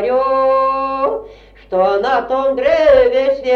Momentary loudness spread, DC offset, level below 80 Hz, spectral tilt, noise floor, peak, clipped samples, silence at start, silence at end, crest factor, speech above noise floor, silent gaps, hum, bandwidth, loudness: 8 LU; under 0.1%; -42 dBFS; -5.5 dB/octave; -39 dBFS; -2 dBFS; under 0.1%; 0 s; 0 s; 12 dB; 26 dB; none; none; 6.6 kHz; -14 LUFS